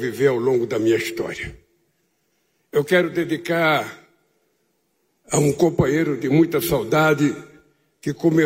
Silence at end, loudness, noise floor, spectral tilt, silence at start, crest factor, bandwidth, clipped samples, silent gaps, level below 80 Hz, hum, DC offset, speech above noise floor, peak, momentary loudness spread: 0 s; -20 LUFS; -69 dBFS; -5.5 dB/octave; 0 s; 16 dB; 16 kHz; under 0.1%; none; -50 dBFS; none; under 0.1%; 49 dB; -6 dBFS; 11 LU